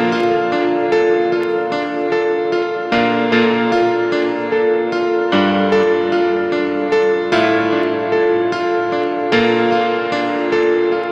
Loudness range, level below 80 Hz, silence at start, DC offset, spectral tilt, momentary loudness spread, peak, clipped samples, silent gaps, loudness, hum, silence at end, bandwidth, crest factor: 1 LU; -56 dBFS; 0 s; under 0.1%; -6 dB/octave; 4 LU; -2 dBFS; under 0.1%; none; -16 LUFS; none; 0 s; 8 kHz; 14 dB